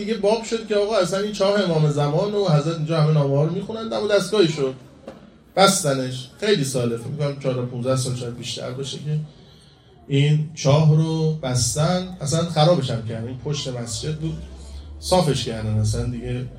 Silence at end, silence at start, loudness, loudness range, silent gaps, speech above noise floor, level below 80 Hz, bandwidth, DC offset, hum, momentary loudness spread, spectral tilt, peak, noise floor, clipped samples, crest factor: 0 s; 0 s; -21 LUFS; 5 LU; none; 29 dB; -44 dBFS; 16 kHz; under 0.1%; none; 11 LU; -5.5 dB/octave; 0 dBFS; -49 dBFS; under 0.1%; 20 dB